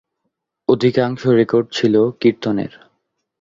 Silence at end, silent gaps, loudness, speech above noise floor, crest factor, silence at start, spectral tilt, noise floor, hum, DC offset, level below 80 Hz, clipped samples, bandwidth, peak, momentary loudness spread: 0.75 s; none; -17 LUFS; 59 dB; 16 dB; 0.7 s; -7 dB/octave; -75 dBFS; none; under 0.1%; -56 dBFS; under 0.1%; 7.6 kHz; -2 dBFS; 8 LU